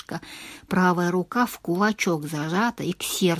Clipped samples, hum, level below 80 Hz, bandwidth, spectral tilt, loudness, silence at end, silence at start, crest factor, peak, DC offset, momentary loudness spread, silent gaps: under 0.1%; none; -60 dBFS; 16 kHz; -5 dB/octave; -24 LUFS; 0 s; 0.1 s; 18 dB; -8 dBFS; under 0.1%; 14 LU; none